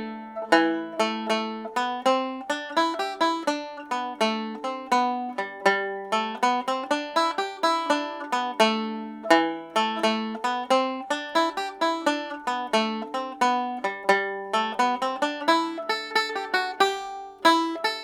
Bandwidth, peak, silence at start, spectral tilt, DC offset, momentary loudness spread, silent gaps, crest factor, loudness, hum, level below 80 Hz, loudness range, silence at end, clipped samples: 17 kHz; -2 dBFS; 0 s; -3 dB/octave; under 0.1%; 8 LU; none; 22 dB; -25 LUFS; none; -72 dBFS; 2 LU; 0 s; under 0.1%